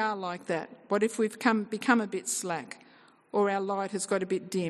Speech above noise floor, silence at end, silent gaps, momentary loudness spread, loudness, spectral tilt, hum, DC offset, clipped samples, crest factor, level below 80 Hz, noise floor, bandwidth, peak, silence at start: 29 dB; 0 s; none; 9 LU; -30 LUFS; -4 dB/octave; none; under 0.1%; under 0.1%; 20 dB; -80 dBFS; -59 dBFS; 12.5 kHz; -10 dBFS; 0 s